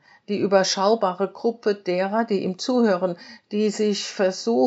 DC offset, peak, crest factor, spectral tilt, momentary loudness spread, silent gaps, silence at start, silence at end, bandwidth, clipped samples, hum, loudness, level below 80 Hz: under 0.1%; -4 dBFS; 18 dB; -4 dB/octave; 6 LU; none; 0.3 s; 0 s; 8 kHz; under 0.1%; none; -23 LUFS; -84 dBFS